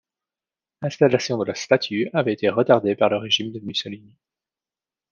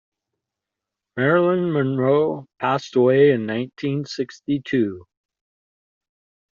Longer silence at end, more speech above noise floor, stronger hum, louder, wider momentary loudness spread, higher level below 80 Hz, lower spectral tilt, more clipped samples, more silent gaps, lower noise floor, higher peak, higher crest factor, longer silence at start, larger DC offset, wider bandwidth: second, 1.15 s vs 1.55 s; first, over 69 dB vs 65 dB; neither; about the same, -21 LUFS vs -20 LUFS; about the same, 11 LU vs 10 LU; about the same, -70 dBFS vs -66 dBFS; about the same, -5 dB/octave vs -6 dB/octave; neither; neither; first, under -90 dBFS vs -85 dBFS; about the same, -2 dBFS vs -4 dBFS; about the same, 20 dB vs 18 dB; second, 0.8 s vs 1.15 s; neither; about the same, 7.4 kHz vs 7.4 kHz